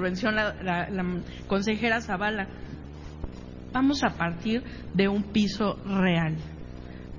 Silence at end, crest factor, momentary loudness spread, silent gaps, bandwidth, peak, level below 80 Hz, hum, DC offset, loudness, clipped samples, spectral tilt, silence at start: 0 s; 20 dB; 17 LU; none; 7.4 kHz; -8 dBFS; -44 dBFS; none; under 0.1%; -27 LUFS; under 0.1%; -6 dB/octave; 0 s